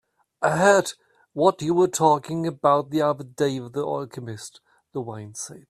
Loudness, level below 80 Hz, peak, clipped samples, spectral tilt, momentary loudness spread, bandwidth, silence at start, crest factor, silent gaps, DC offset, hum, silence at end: -22 LUFS; -66 dBFS; -2 dBFS; under 0.1%; -5 dB/octave; 17 LU; 13.5 kHz; 0.4 s; 20 dB; none; under 0.1%; none; 0.1 s